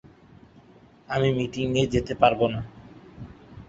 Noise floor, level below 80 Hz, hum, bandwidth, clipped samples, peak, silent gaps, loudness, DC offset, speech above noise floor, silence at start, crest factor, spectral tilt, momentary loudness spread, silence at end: -53 dBFS; -48 dBFS; none; 8 kHz; under 0.1%; -4 dBFS; none; -24 LUFS; under 0.1%; 30 dB; 1.1 s; 24 dB; -6.5 dB/octave; 23 LU; 0.05 s